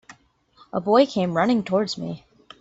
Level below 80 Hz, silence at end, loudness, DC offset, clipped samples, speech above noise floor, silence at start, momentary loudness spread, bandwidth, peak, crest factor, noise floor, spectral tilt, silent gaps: -62 dBFS; 0.45 s; -22 LUFS; under 0.1%; under 0.1%; 36 dB; 0.1 s; 14 LU; 8 kHz; -4 dBFS; 18 dB; -57 dBFS; -6 dB/octave; none